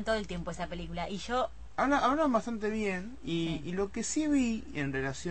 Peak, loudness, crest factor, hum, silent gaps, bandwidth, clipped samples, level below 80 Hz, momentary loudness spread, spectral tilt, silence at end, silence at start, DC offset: -14 dBFS; -32 LUFS; 18 dB; none; none; 8.8 kHz; under 0.1%; -50 dBFS; 11 LU; -5 dB/octave; 0 s; 0 s; 0.5%